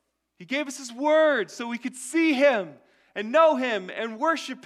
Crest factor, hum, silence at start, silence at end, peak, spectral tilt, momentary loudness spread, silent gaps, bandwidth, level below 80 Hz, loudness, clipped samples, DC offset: 18 dB; none; 0.4 s; 0.1 s; -8 dBFS; -3.5 dB/octave; 13 LU; none; 13.5 kHz; -82 dBFS; -24 LUFS; under 0.1%; under 0.1%